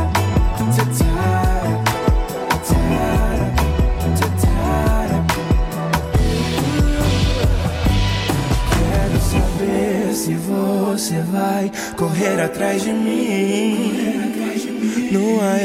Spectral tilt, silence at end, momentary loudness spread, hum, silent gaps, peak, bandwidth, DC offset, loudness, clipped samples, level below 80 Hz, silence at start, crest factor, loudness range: -6 dB/octave; 0 s; 3 LU; none; none; -4 dBFS; 16.5 kHz; under 0.1%; -18 LUFS; under 0.1%; -24 dBFS; 0 s; 14 dB; 1 LU